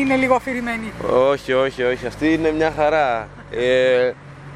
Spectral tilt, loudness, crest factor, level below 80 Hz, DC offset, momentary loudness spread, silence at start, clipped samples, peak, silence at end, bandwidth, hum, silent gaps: -5.5 dB/octave; -19 LUFS; 16 dB; -44 dBFS; under 0.1%; 8 LU; 0 s; under 0.1%; -2 dBFS; 0 s; 12 kHz; none; none